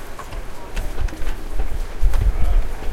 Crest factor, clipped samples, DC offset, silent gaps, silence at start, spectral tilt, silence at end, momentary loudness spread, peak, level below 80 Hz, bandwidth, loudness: 14 dB; under 0.1%; under 0.1%; none; 0 s; -5.5 dB/octave; 0 s; 12 LU; -2 dBFS; -20 dBFS; 13 kHz; -27 LUFS